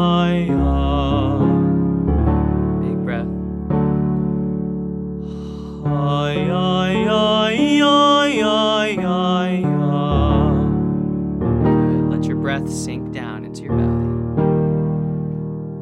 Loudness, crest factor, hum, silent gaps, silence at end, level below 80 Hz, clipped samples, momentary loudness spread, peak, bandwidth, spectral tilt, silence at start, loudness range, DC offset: -18 LUFS; 16 dB; none; none; 0 s; -30 dBFS; under 0.1%; 10 LU; -2 dBFS; 11 kHz; -7 dB/octave; 0 s; 5 LU; under 0.1%